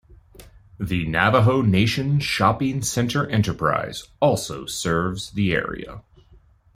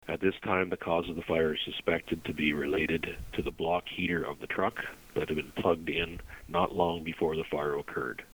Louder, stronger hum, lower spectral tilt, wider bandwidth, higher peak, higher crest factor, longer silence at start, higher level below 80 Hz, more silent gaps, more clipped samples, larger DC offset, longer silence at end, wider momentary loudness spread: first, -21 LUFS vs -32 LUFS; neither; about the same, -5.5 dB/octave vs -6 dB/octave; second, 16 kHz vs over 20 kHz; first, -2 dBFS vs -12 dBFS; about the same, 20 dB vs 20 dB; about the same, 0.1 s vs 0.05 s; first, -46 dBFS vs -52 dBFS; neither; neither; neither; first, 0.75 s vs 0.1 s; first, 10 LU vs 7 LU